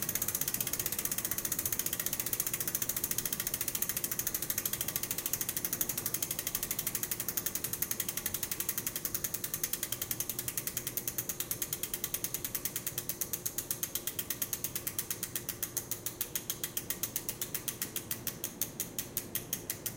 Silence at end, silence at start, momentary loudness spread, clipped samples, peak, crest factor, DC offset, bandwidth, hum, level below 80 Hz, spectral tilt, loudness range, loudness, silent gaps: 0 s; 0 s; 4 LU; under 0.1%; -10 dBFS; 26 dB; under 0.1%; 17.5 kHz; none; -60 dBFS; -1.5 dB/octave; 4 LU; -34 LUFS; none